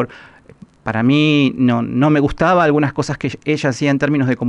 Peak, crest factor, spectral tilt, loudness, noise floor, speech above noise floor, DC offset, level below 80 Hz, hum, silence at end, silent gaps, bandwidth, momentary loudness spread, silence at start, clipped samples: -4 dBFS; 12 dB; -6.5 dB/octave; -16 LUFS; -43 dBFS; 28 dB; under 0.1%; -42 dBFS; none; 0 s; none; 10.5 kHz; 9 LU; 0 s; under 0.1%